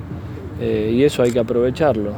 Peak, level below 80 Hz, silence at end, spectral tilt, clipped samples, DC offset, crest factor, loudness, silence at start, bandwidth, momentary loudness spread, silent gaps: -4 dBFS; -40 dBFS; 0 s; -7 dB/octave; under 0.1%; under 0.1%; 14 dB; -18 LUFS; 0 s; 19.5 kHz; 15 LU; none